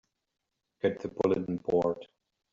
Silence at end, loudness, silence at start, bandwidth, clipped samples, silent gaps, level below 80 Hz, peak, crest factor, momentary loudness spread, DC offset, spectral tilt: 0.5 s; -31 LUFS; 0.85 s; 7.4 kHz; under 0.1%; none; -66 dBFS; -12 dBFS; 20 dB; 4 LU; under 0.1%; -6.5 dB/octave